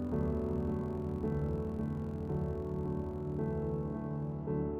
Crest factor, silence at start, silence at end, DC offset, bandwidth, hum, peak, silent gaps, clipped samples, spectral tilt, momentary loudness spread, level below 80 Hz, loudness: 12 dB; 0 s; 0 s; under 0.1%; 4.7 kHz; none; -22 dBFS; none; under 0.1%; -11 dB/octave; 4 LU; -46 dBFS; -37 LUFS